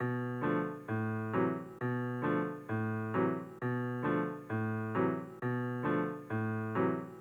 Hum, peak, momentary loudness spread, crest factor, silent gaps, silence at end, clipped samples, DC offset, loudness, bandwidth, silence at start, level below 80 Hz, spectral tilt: none; -18 dBFS; 4 LU; 16 dB; none; 0 s; under 0.1%; under 0.1%; -35 LUFS; 14 kHz; 0 s; -72 dBFS; -9.5 dB/octave